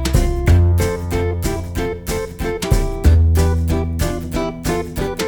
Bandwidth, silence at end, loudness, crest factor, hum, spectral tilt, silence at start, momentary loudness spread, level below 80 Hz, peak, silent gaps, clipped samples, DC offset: over 20 kHz; 0 s; -18 LUFS; 16 dB; none; -6 dB/octave; 0 s; 9 LU; -20 dBFS; 0 dBFS; none; under 0.1%; under 0.1%